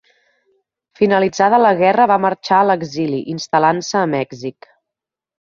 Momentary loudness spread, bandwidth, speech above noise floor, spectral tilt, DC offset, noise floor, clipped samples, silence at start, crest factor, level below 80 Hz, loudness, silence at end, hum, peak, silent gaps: 10 LU; 7.4 kHz; 70 dB; -5.5 dB/octave; under 0.1%; -85 dBFS; under 0.1%; 1 s; 16 dB; -60 dBFS; -15 LUFS; 1 s; none; -2 dBFS; none